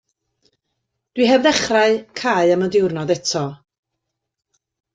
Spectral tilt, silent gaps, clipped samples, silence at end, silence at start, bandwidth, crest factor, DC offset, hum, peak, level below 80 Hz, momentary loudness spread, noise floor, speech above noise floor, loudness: -4 dB/octave; none; under 0.1%; 1.4 s; 1.15 s; 9.4 kHz; 18 dB; under 0.1%; none; -2 dBFS; -58 dBFS; 8 LU; -79 dBFS; 62 dB; -17 LUFS